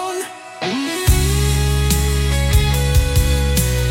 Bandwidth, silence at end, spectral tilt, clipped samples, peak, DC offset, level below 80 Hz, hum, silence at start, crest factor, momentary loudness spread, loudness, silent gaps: 17 kHz; 0 s; -4.5 dB/octave; under 0.1%; -2 dBFS; under 0.1%; -20 dBFS; none; 0 s; 14 dB; 8 LU; -17 LUFS; none